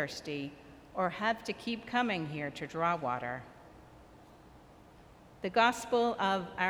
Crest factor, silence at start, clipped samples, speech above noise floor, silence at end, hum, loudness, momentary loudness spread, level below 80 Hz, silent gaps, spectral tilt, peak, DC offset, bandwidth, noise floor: 22 dB; 0 s; under 0.1%; 24 dB; 0 s; none; -33 LUFS; 14 LU; -64 dBFS; none; -4.5 dB/octave; -12 dBFS; under 0.1%; over 20 kHz; -57 dBFS